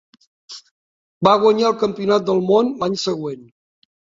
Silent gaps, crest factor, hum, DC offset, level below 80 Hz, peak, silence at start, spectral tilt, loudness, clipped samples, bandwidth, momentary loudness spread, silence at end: 0.71-1.21 s; 18 dB; none; under 0.1%; -60 dBFS; -2 dBFS; 0.5 s; -5.5 dB/octave; -17 LUFS; under 0.1%; 7.8 kHz; 23 LU; 0.75 s